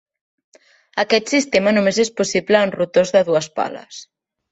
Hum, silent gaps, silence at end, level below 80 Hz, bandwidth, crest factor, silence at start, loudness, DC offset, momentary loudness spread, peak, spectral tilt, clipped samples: none; none; 0.5 s; -60 dBFS; 8.2 kHz; 16 dB; 0.95 s; -17 LUFS; under 0.1%; 12 LU; -2 dBFS; -4 dB/octave; under 0.1%